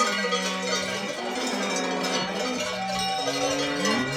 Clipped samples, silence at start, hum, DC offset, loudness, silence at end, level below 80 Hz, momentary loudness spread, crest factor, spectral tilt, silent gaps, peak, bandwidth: under 0.1%; 0 s; none; under 0.1%; -26 LUFS; 0 s; -60 dBFS; 4 LU; 16 dB; -2.5 dB/octave; none; -10 dBFS; 16.5 kHz